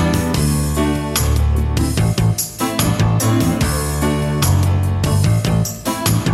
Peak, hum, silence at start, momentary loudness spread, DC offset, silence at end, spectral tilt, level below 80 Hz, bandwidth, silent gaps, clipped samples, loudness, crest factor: -2 dBFS; none; 0 s; 3 LU; under 0.1%; 0 s; -5.5 dB/octave; -24 dBFS; 16 kHz; none; under 0.1%; -17 LUFS; 14 dB